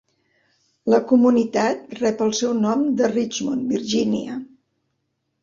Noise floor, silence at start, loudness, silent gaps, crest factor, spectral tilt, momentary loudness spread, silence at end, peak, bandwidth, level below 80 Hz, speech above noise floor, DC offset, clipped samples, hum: -74 dBFS; 0.85 s; -20 LUFS; none; 18 dB; -5 dB/octave; 9 LU; 1 s; -4 dBFS; 7.6 kHz; -62 dBFS; 54 dB; under 0.1%; under 0.1%; none